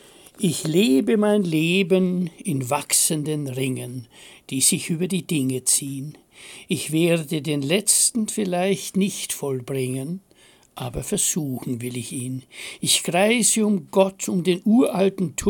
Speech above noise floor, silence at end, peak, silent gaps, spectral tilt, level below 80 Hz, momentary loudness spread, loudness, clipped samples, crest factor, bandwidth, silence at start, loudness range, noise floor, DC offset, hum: 26 dB; 0 s; -4 dBFS; none; -4 dB/octave; -56 dBFS; 13 LU; -21 LUFS; under 0.1%; 20 dB; 17 kHz; 0.4 s; 6 LU; -48 dBFS; under 0.1%; none